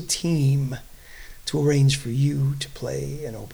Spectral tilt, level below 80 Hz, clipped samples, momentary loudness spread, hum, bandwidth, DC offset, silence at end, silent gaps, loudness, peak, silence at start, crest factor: -5.5 dB/octave; -44 dBFS; under 0.1%; 14 LU; none; 19.5 kHz; under 0.1%; 0 s; none; -24 LUFS; -10 dBFS; 0 s; 14 dB